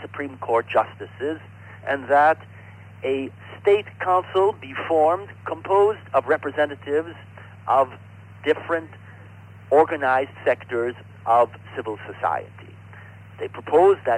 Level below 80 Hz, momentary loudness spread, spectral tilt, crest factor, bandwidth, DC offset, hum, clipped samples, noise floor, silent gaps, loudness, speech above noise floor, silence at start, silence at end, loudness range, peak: -66 dBFS; 17 LU; -6.5 dB/octave; 16 dB; 9.4 kHz; under 0.1%; none; under 0.1%; -43 dBFS; none; -22 LUFS; 22 dB; 0 s; 0 s; 3 LU; -6 dBFS